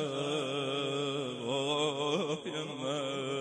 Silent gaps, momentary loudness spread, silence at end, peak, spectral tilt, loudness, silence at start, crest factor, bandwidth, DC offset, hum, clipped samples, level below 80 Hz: none; 5 LU; 0 s; -18 dBFS; -4.5 dB/octave; -34 LUFS; 0 s; 16 dB; 10.5 kHz; under 0.1%; none; under 0.1%; -76 dBFS